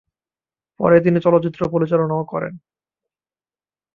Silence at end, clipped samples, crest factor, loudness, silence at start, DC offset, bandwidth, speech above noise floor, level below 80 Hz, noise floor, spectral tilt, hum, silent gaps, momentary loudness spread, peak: 1.35 s; under 0.1%; 18 dB; -18 LUFS; 0.8 s; under 0.1%; 4.7 kHz; over 73 dB; -56 dBFS; under -90 dBFS; -10 dB/octave; none; none; 12 LU; -2 dBFS